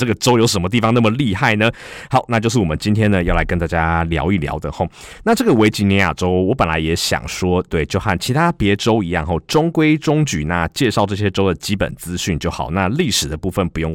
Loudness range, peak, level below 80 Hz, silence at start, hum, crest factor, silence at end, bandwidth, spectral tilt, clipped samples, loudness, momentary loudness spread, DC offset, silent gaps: 2 LU; -2 dBFS; -32 dBFS; 0 s; none; 14 dB; 0 s; 17 kHz; -5.5 dB/octave; under 0.1%; -17 LUFS; 6 LU; under 0.1%; none